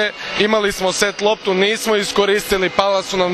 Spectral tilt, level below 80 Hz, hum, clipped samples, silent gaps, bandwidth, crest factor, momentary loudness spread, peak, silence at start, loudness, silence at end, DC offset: -3 dB/octave; -44 dBFS; none; under 0.1%; none; 14 kHz; 16 dB; 2 LU; 0 dBFS; 0 s; -16 LUFS; 0 s; under 0.1%